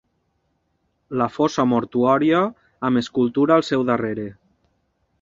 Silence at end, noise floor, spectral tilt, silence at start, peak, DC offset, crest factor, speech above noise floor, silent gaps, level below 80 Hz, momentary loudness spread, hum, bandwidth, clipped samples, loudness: 0.9 s; -70 dBFS; -6.5 dB/octave; 1.1 s; -2 dBFS; under 0.1%; 18 dB; 50 dB; none; -58 dBFS; 10 LU; none; 7.6 kHz; under 0.1%; -20 LUFS